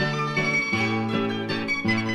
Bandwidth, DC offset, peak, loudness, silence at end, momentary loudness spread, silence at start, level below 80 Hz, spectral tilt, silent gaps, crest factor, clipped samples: 12 kHz; under 0.1%; -12 dBFS; -24 LUFS; 0 s; 4 LU; 0 s; -56 dBFS; -5.5 dB/octave; none; 14 dB; under 0.1%